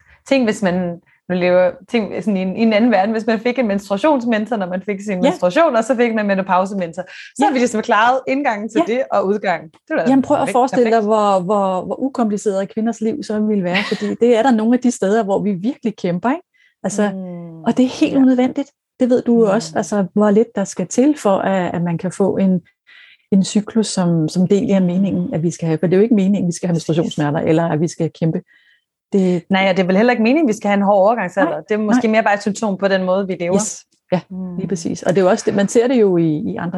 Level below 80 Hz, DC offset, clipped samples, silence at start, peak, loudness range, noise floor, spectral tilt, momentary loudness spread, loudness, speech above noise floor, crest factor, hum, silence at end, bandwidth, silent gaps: -60 dBFS; under 0.1%; under 0.1%; 0.25 s; -2 dBFS; 2 LU; -58 dBFS; -6 dB/octave; 8 LU; -17 LUFS; 42 dB; 14 dB; none; 0 s; 12 kHz; none